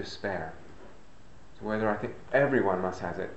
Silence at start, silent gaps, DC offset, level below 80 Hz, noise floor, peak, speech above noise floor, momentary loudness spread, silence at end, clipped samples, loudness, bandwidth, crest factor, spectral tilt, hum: 0 s; none; 0.6%; -58 dBFS; -55 dBFS; -12 dBFS; 25 dB; 15 LU; 0 s; under 0.1%; -30 LUFS; 8.4 kHz; 18 dB; -6.5 dB/octave; none